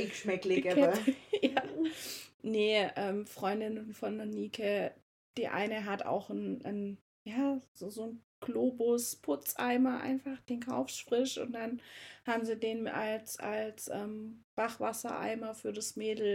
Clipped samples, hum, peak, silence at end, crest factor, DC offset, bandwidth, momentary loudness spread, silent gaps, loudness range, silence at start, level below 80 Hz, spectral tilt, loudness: under 0.1%; none; -14 dBFS; 0 s; 22 dB; under 0.1%; 16.5 kHz; 12 LU; 2.34-2.40 s, 5.02-5.34 s, 7.01-7.25 s, 7.68-7.75 s, 8.24-8.42 s, 14.44-14.57 s; 5 LU; 0 s; -78 dBFS; -4 dB/octave; -35 LUFS